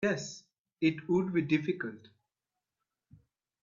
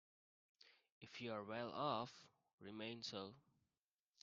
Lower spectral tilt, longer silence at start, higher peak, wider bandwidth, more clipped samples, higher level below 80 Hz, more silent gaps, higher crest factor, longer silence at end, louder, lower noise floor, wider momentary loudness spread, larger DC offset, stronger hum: first, -6 dB/octave vs -3 dB/octave; second, 0 s vs 0.65 s; first, -16 dBFS vs -28 dBFS; about the same, 7.6 kHz vs 7.4 kHz; neither; first, -72 dBFS vs -88 dBFS; second, 0.59-0.65 s vs 0.92-1.01 s, 2.53-2.58 s; about the same, 20 dB vs 24 dB; first, 1.65 s vs 0.8 s; first, -32 LUFS vs -49 LUFS; about the same, -90 dBFS vs under -90 dBFS; second, 13 LU vs 22 LU; neither; neither